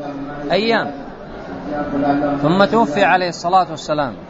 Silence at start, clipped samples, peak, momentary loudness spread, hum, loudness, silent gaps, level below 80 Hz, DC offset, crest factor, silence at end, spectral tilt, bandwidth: 0 s; under 0.1%; 0 dBFS; 16 LU; none; -17 LUFS; none; -44 dBFS; under 0.1%; 18 dB; 0 s; -5.5 dB/octave; 8 kHz